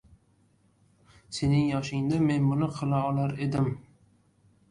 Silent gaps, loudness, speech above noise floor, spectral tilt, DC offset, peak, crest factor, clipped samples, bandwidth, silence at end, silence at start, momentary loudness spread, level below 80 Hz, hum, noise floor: none; -27 LUFS; 39 dB; -7.5 dB/octave; under 0.1%; -14 dBFS; 14 dB; under 0.1%; 11 kHz; 0.9 s; 1.3 s; 6 LU; -54 dBFS; none; -65 dBFS